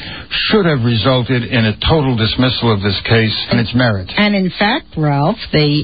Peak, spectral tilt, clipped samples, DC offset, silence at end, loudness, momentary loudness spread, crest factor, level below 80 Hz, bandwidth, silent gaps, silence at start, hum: 0 dBFS; -12 dB/octave; under 0.1%; 0.7%; 0 s; -14 LUFS; 3 LU; 14 dB; -34 dBFS; 5 kHz; none; 0 s; none